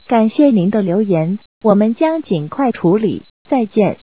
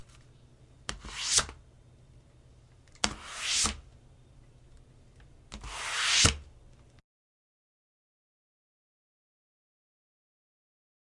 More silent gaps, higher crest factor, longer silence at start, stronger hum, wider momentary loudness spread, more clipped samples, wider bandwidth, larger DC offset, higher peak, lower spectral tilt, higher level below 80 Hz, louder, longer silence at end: first, 1.46-1.61 s, 3.30-3.45 s vs none; second, 14 dB vs 36 dB; about the same, 0.1 s vs 0.15 s; neither; second, 8 LU vs 20 LU; neither; second, 4 kHz vs 11.5 kHz; first, 0.4% vs under 0.1%; about the same, 0 dBFS vs 0 dBFS; first, -12 dB/octave vs -1 dB/octave; about the same, -56 dBFS vs -52 dBFS; first, -15 LUFS vs -28 LUFS; second, 0.1 s vs 4.55 s